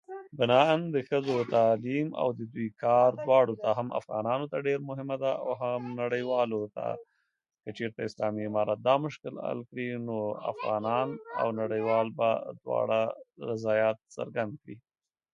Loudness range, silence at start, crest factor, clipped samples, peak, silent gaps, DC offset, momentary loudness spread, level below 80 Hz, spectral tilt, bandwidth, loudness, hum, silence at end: 6 LU; 0.1 s; 22 dB; under 0.1%; -8 dBFS; none; under 0.1%; 12 LU; -74 dBFS; -7 dB/octave; 7.6 kHz; -29 LUFS; none; 0.55 s